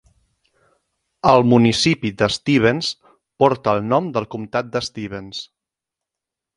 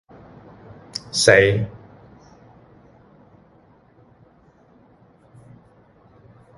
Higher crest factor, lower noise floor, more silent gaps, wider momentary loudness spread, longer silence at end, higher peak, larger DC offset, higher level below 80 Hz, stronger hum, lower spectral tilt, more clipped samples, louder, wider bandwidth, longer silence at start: second, 20 dB vs 26 dB; first, -85 dBFS vs -54 dBFS; neither; second, 16 LU vs 29 LU; second, 1.1 s vs 4.85 s; about the same, 0 dBFS vs 0 dBFS; neither; about the same, -52 dBFS vs -52 dBFS; neither; first, -5.5 dB/octave vs -3.5 dB/octave; neither; about the same, -18 LUFS vs -18 LUFS; about the same, 11 kHz vs 11.5 kHz; first, 1.25 s vs 0.95 s